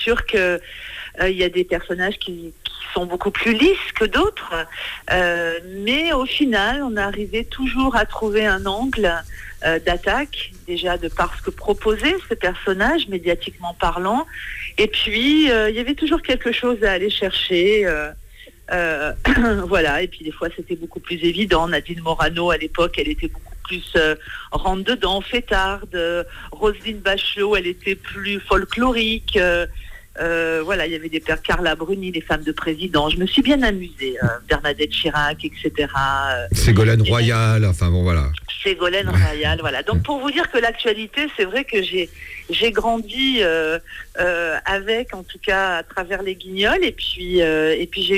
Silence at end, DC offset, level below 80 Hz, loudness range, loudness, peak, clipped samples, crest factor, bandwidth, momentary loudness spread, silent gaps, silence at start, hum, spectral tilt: 0 s; under 0.1%; -34 dBFS; 4 LU; -20 LUFS; -4 dBFS; under 0.1%; 16 dB; 16 kHz; 10 LU; none; 0 s; none; -5.5 dB/octave